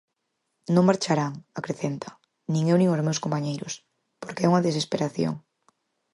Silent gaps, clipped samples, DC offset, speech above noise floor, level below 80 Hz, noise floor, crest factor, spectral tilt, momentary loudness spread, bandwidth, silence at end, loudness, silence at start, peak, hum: none; under 0.1%; under 0.1%; 54 dB; -68 dBFS; -78 dBFS; 20 dB; -6 dB/octave; 17 LU; 11.5 kHz; 0.75 s; -25 LUFS; 0.7 s; -6 dBFS; none